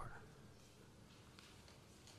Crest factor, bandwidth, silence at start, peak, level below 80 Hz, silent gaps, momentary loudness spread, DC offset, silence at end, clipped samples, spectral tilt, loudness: 22 dB; 14.5 kHz; 0 s; -38 dBFS; -68 dBFS; none; 5 LU; under 0.1%; 0 s; under 0.1%; -4 dB/octave; -62 LUFS